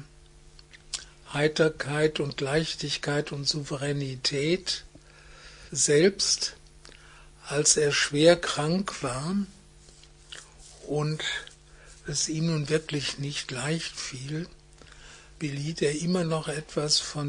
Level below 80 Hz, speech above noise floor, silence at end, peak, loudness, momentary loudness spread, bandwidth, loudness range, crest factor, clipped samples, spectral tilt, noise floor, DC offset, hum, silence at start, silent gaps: -54 dBFS; 26 dB; 0 s; -6 dBFS; -27 LUFS; 16 LU; 10.5 kHz; 8 LU; 24 dB; under 0.1%; -3.5 dB/octave; -52 dBFS; under 0.1%; none; 0 s; none